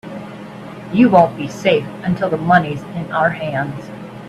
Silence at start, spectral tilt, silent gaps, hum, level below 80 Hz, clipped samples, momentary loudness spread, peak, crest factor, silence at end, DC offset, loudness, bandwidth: 0.05 s; -7 dB/octave; none; none; -52 dBFS; under 0.1%; 20 LU; 0 dBFS; 18 dB; 0 s; under 0.1%; -17 LUFS; 12.5 kHz